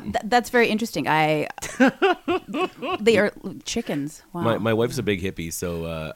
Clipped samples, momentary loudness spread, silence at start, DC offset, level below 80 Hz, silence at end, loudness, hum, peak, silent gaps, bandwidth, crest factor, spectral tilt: under 0.1%; 10 LU; 0 s; under 0.1%; -50 dBFS; 0 s; -23 LUFS; none; -4 dBFS; none; 17 kHz; 20 dB; -5 dB/octave